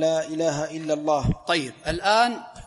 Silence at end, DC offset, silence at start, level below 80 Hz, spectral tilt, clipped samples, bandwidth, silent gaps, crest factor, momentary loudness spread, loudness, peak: 0 s; under 0.1%; 0 s; -42 dBFS; -4.5 dB/octave; under 0.1%; 11.5 kHz; none; 18 dB; 7 LU; -24 LUFS; -6 dBFS